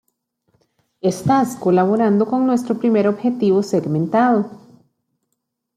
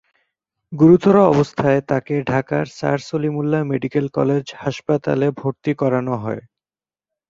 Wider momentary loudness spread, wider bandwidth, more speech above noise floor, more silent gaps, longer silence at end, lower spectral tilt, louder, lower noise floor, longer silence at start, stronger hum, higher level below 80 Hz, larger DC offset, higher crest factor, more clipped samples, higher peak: second, 5 LU vs 11 LU; first, 14.5 kHz vs 7.8 kHz; second, 58 dB vs over 72 dB; neither; first, 1.2 s vs 0.9 s; about the same, -7.5 dB/octave vs -8 dB/octave; about the same, -17 LUFS vs -18 LUFS; second, -75 dBFS vs under -90 dBFS; first, 1.05 s vs 0.7 s; neither; second, -60 dBFS vs -54 dBFS; neither; about the same, 14 dB vs 18 dB; neither; about the same, -4 dBFS vs -2 dBFS